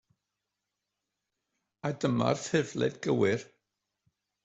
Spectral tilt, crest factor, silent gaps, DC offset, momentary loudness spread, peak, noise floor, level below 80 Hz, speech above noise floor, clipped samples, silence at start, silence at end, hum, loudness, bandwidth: -5.5 dB/octave; 22 dB; none; under 0.1%; 8 LU; -12 dBFS; -86 dBFS; -70 dBFS; 57 dB; under 0.1%; 1.85 s; 1 s; 50 Hz at -60 dBFS; -30 LUFS; 8.2 kHz